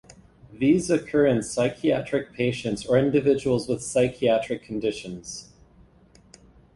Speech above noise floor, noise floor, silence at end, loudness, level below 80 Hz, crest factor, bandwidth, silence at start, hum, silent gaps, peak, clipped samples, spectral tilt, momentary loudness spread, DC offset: 32 dB; -55 dBFS; 1.3 s; -24 LUFS; -54 dBFS; 18 dB; 11.5 kHz; 0.5 s; none; none; -6 dBFS; under 0.1%; -5.5 dB/octave; 10 LU; under 0.1%